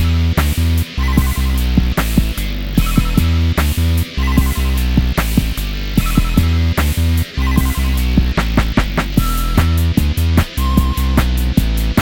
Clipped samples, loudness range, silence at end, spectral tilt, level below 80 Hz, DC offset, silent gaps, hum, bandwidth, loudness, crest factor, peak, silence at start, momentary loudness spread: under 0.1%; 1 LU; 0 s; -5.5 dB/octave; -16 dBFS; under 0.1%; none; none; 17.5 kHz; -16 LUFS; 14 dB; 0 dBFS; 0 s; 2 LU